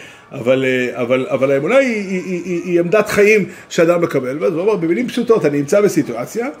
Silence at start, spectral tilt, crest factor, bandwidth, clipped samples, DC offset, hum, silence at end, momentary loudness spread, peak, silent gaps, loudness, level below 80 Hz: 0 s; -5.5 dB/octave; 14 dB; 16 kHz; under 0.1%; under 0.1%; none; 0 s; 9 LU; 0 dBFS; none; -16 LUFS; -58 dBFS